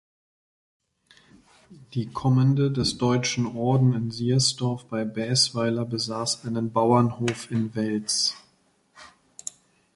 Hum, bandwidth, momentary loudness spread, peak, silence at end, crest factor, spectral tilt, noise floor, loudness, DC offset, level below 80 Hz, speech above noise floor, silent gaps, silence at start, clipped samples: none; 11.5 kHz; 10 LU; -8 dBFS; 0.9 s; 18 dB; -5 dB/octave; -65 dBFS; -24 LUFS; under 0.1%; -58 dBFS; 41 dB; none; 1.7 s; under 0.1%